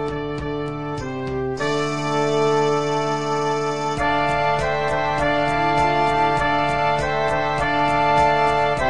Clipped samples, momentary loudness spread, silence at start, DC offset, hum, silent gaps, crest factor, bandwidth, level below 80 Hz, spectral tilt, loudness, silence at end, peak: under 0.1%; 9 LU; 0 s; 1%; none; none; 14 dB; 10.5 kHz; -40 dBFS; -5 dB/octave; -20 LUFS; 0 s; -6 dBFS